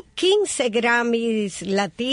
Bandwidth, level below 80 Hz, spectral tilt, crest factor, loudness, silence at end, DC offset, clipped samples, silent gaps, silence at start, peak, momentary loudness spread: 11 kHz; -60 dBFS; -3.5 dB/octave; 14 dB; -21 LUFS; 0 s; under 0.1%; under 0.1%; none; 0.15 s; -6 dBFS; 5 LU